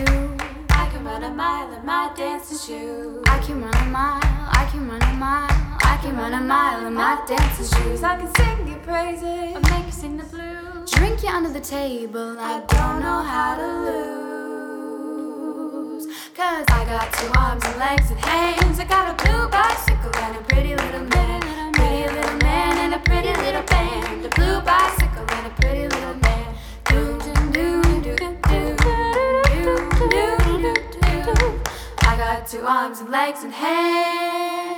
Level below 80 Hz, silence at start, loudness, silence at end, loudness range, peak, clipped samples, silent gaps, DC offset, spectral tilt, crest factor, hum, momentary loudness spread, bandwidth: -24 dBFS; 0 s; -21 LUFS; 0 s; 5 LU; -2 dBFS; under 0.1%; none; under 0.1%; -5 dB/octave; 18 dB; none; 11 LU; 18.5 kHz